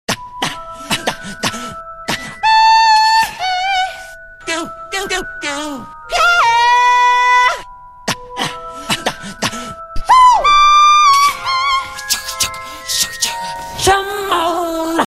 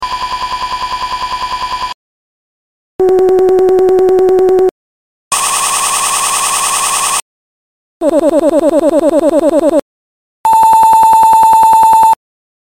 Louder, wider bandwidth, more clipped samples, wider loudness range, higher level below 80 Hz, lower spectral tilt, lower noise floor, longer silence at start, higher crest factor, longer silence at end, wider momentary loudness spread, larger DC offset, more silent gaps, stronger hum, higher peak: second, -13 LUFS vs -10 LUFS; about the same, 16 kHz vs 17 kHz; neither; about the same, 6 LU vs 5 LU; about the same, -38 dBFS vs -42 dBFS; about the same, -1.5 dB/octave vs -2 dB/octave; second, -34 dBFS vs under -90 dBFS; about the same, 0.1 s vs 0 s; about the same, 14 dB vs 10 dB; second, 0 s vs 0.5 s; first, 17 LU vs 11 LU; neither; second, none vs 1.94-2.99 s, 4.71-5.31 s, 7.22-8.00 s, 9.82-10.44 s; second, none vs 50 Hz at -55 dBFS; about the same, 0 dBFS vs 0 dBFS